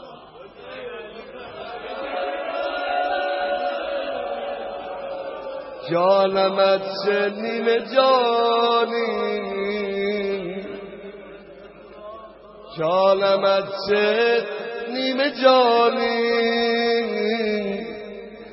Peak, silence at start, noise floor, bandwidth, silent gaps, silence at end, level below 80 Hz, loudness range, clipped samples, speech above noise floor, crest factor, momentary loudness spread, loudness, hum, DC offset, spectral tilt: -4 dBFS; 0 s; -42 dBFS; 5.8 kHz; none; 0 s; -60 dBFS; 8 LU; under 0.1%; 24 dB; 20 dB; 20 LU; -21 LUFS; none; under 0.1%; -7.5 dB/octave